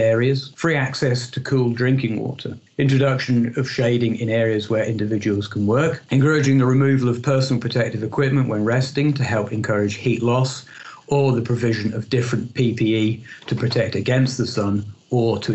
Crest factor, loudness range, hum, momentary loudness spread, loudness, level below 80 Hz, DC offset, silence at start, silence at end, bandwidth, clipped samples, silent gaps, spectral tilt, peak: 14 dB; 3 LU; none; 6 LU; -20 LUFS; -58 dBFS; under 0.1%; 0 s; 0 s; 8.4 kHz; under 0.1%; none; -6.5 dB/octave; -6 dBFS